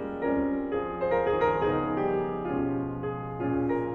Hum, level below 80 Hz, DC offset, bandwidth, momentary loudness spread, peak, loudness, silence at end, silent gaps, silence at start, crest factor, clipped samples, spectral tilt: none; -50 dBFS; under 0.1%; 4.6 kHz; 7 LU; -12 dBFS; -28 LUFS; 0 s; none; 0 s; 16 dB; under 0.1%; -9.5 dB/octave